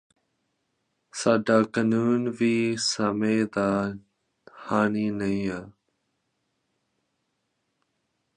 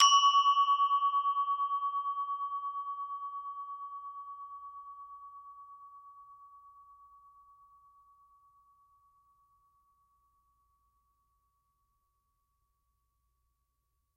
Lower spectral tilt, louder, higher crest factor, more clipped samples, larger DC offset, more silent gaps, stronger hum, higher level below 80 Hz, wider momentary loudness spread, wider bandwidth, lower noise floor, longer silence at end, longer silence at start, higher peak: first, -5 dB/octave vs 5 dB/octave; first, -25 LUFS vs -30 LUFS; about the same, 22 dB vs 24 dB; neither; neither; neither; neither; first, -62 dBFS vs -82 dBFS; second, 11 LU vs 25 LU; first, 10.5 kHz vs 9.2 kHz; about the same, -77 dBFS vs -80 dBFS; second, 2.65 s vs 7.6 s; first, 1.15 s vs 0 s; first, -6 dBFS vs -12 dBFS